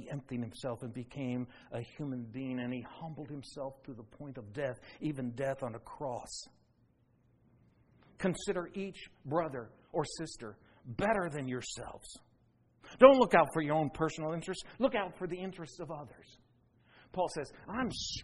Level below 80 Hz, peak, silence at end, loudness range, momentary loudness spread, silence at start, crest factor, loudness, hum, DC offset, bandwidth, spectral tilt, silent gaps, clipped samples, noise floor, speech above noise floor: -62 dBFS; -6 dBFS; 0 s; 13 LU; 15 LU; 0 s; 28 dB; -34 LUFS; none; under 0.1%; 11.5 kHz; -5.5 dB/octave; none; under 0.1%; -70 dBFS; 36 dB